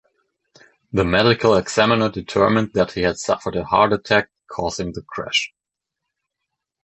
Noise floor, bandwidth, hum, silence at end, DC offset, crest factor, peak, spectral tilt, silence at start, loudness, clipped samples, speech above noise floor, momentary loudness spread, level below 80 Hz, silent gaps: -83 dBFS; 8.4 kHz; none; 1.35 s; under 0.1%; 18 dB; -2 dBFS; -4.5 dB/octave; 0.95 s; -19 LUFS; under 0.1%; 64 dB; 11 LU; -44 dBFS; none